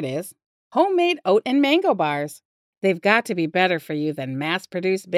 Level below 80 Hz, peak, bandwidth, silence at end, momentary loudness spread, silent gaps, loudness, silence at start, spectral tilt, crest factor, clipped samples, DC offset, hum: -80 dBFS; -4 dBFS; 15.5 kHz; 0 s; 9 LU; 0.46-0.70 s, 2.45-2.81 s; -21 LUFS; 0 s; -5.5 dB/octave; 18 dB; under 0.1%; under 0.1%; none